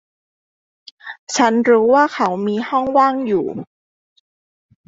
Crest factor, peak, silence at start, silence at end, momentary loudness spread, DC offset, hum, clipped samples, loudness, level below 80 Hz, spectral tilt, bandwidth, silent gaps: 16 dB; -2 dBFS; 1.05 s; 1.25 s; 20 LU; under 0.1%; none; under 0.1%; -16 LUFS; -62 dBFS; -4.5 dB/octave; 8 kHz; 1.19-1.27 s